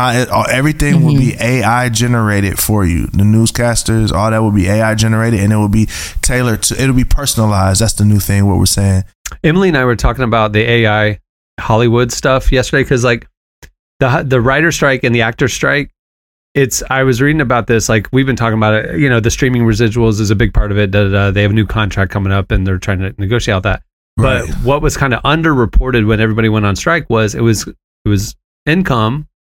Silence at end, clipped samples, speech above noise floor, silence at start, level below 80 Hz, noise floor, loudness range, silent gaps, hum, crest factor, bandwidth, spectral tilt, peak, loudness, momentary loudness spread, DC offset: 0.25 s; under 0.1%; over 79 dB; 0 s; -24 dBFS; under -90 dBFS; 2 LU; 9.15-9.25 s, 11.29-11.57 s, 13.37-13.62 s, 13.79-14.00 s, 15.99-16.55 s, 23.93-24.17 s, 27.84-28.05 s, 28.44-28.66 s; none; 12 dB; 17 kHz; -5.5 dB/octave; 0 dBFS; -12 LUFS; 5 LU; under 0.1%